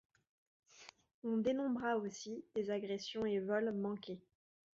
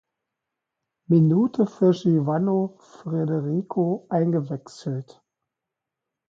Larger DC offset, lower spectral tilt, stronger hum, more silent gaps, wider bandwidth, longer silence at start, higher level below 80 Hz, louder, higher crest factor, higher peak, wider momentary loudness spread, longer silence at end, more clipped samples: neither; second, -4.5 dB/octave vs -9.5 dB/octave; neither; first, 1.14-1.22 s vs none; about the same, 7.6 kHz vs 7.6 kHz; second, 0.75 s vs 1.1 s; second, -78 dBFS vs -70 dBFS; second, -40 LUFS vs -23 LUFS; about the same, 16 dB vs 16 dB; second, -24 dBFS vs -8 dBFS; first, 18 LU vs 12 LU; second, 0.6 s vs 1.25 s; neither